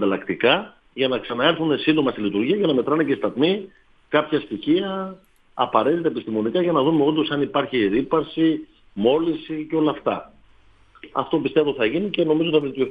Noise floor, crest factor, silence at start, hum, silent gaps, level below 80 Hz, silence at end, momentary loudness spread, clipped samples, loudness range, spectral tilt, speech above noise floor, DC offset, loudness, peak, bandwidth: -53 dBFS; 20 dB; 0 s; none; none; -58 dBFS; 0 s; 8 LU; under 0.1%; 3 LU; -8.5 dB/octave; 32 dB; under 0.1%; -21 LUFS; -2 dBFS; 4.9 kHz